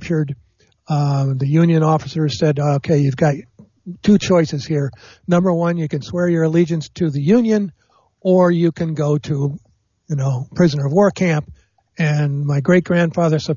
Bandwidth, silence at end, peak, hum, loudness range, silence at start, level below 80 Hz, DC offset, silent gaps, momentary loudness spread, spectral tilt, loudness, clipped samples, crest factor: 7.4 kHz; 0 s; -4 dBFS; none; 2 LU; 0 s; -52 dBFS; under 0.1%; none; 8 LU; -7.5 dB/octave; -17 LUFS; under 0.1%; 14 dB